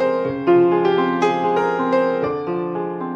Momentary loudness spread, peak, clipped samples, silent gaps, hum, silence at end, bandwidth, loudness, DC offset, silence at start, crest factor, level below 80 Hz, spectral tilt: 9 LU; -4 dBFS; under 0.1%; none; none; 0 s; 7.6 kHz; -19 LUFS; under 0.1%; 0 s; 14 dB; -60 dBFS; -7 dB/octave